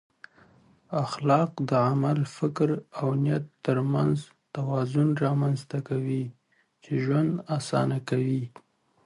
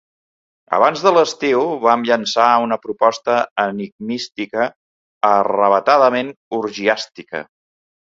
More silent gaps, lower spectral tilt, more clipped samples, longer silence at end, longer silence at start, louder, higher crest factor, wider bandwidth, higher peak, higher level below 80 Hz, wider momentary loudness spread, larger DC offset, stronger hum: second, none vs 3.51-3.56 s, 3.92-3.99 s, 4.76-5.21 s, 6.36-6.51 s; first, -8 dB/octave vs -4 dB/octave; neither; second, 0.6 s vs 0.75 s; first, 0.9 s vs 0.7 s; second, -27 LUFS vs -17 LUFS; about the same, 18 dB vs 18 dB; first, 11.5 kHz vs 7.8 kHz; second, -8 dBFS vs 0 dBFS; about the same, -66 dBFS vs -66 dBFS; second, 8 LU vs 12 LU; neither; neither